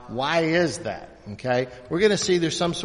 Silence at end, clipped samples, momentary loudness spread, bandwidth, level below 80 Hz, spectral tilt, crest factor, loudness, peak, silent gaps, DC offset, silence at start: 0 s; under 0.1%; 13 LU; 10.5 kHz; -54 dBFS; -4.5 dB/octave; 18 dB; -23 LUFS; -6 dBFS; none; under 0.1%; 0 s